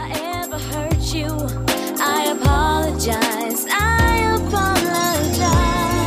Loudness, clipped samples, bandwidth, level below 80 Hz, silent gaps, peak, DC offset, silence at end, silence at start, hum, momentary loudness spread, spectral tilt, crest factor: -19 LUFS; under 0.1%; 16 kHz; -26 dBFS; none; -4 dBFS; under 0.1%; 0 s; 0 s; none; 8 LU; -4.5 dB/octave; 14 dB